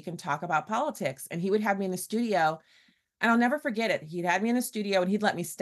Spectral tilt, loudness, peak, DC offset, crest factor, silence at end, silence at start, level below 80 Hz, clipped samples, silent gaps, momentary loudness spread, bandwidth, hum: -5 dB/octave; -28 LUFS; -12 dBFS; under 0.1%; 16 dB; 0 s; 0.05 s; -76 dBFS; under 0.1%; none; 8 LU; 12.5 kHz; none